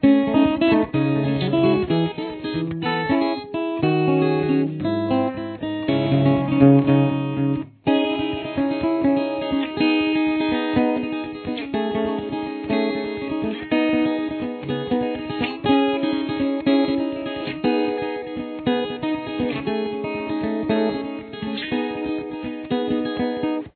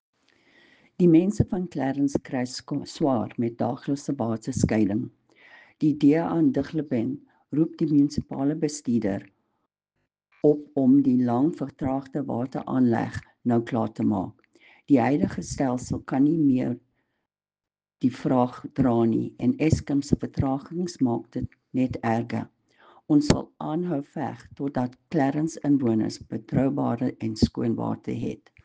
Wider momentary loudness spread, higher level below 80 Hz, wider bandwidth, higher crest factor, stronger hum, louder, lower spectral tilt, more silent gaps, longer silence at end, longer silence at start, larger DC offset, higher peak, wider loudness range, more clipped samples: about the same, 9 LU vs 10 LU; about the same, -50 dBFS vs -50 dBFS; second, 4.5 kHz vs 9.4 kHz; about the same, 20 dB vs 20 dB; neither; first, -22 LUFS vs -25 LUFS; first, -10.5 dB/octave vs -7.5 dB/octave; neither; second, 0.05 s vs 0.3 s; second, 0 s vs 1 s; neither; first, 0 dBFS vs -4 dBFS; about the same, 5 LU vs 3 LU; neither